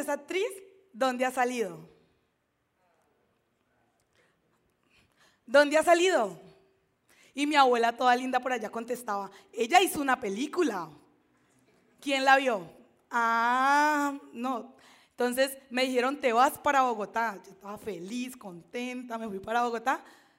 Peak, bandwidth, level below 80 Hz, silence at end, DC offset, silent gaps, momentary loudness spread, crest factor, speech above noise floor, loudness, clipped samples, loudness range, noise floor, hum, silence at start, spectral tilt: -6 dBFS; 16 kHz; -74 dBFS; 0.35 s; under 0.1%; none; 15 LU; 22 dB; 48 dB; -28 LUFS; under 0.1%; 7 LU; -76 dBFS; none; 0 s; -3 dB/octave